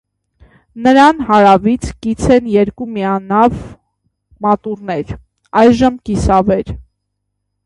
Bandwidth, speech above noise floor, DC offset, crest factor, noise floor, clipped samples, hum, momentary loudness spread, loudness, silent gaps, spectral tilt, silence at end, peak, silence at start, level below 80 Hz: 11.5 kHz; 60 dB; under 0.1%; 14 dB; -71 dBFS; under 0.1%; 50 Hz at -40 dBFS; 13 LU; -13 LUFS; none; -6.5 dB/octave; 0.85 s; 0 dBFS; 0.75 s; -32 dBFS